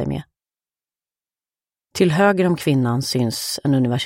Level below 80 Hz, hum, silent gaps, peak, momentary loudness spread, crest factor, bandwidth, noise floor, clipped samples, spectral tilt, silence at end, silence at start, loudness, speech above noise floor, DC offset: -52 dBFS; none; none; -2 dBFS; 10 LU; 18 dB; 16.5 kHz; under -90 dBFS; under 0.1%; -5.5 dB/octave; 0 s; 0 s; -19 LUFS; over 72 dB; under 0.1%